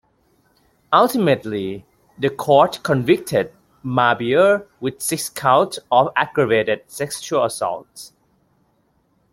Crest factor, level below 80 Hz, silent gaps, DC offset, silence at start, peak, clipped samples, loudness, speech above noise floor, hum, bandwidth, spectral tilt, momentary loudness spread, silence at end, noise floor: 18 dB; -60 dBFS; none; under 0.1%; 0.9 s; -2 dBFS; under 0.1%; -19 LUFS; 45 dB; none; 16.5 kHz; -4.5 dB/octave; 13 LU; 1.25 s; -63 dBFS